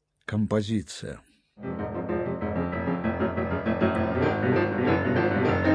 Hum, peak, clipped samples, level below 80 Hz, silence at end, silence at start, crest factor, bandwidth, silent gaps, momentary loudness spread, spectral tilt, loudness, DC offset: none; -10 dBFS; under 0.1%; -50 dBFS; 0 s; 0.3 s; 16 dB; 10.5 kHz; none; 12 LU; -7.5 dB/octave; -27 LUFS; under 0.1%